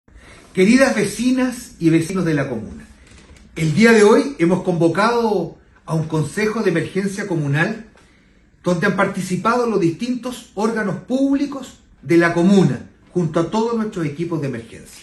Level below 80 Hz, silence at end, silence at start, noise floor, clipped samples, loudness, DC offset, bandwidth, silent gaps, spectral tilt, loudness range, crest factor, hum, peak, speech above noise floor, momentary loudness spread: -50 dBFS; 0 s; 0.15 s; -52 dBFS; under 0.1%; -18 LUFS; under 0.1%; 13 kHz; none; -6 dB/octave; 4 LU; 18 dB; none; 0 dBFS; 35 dB; 13 LU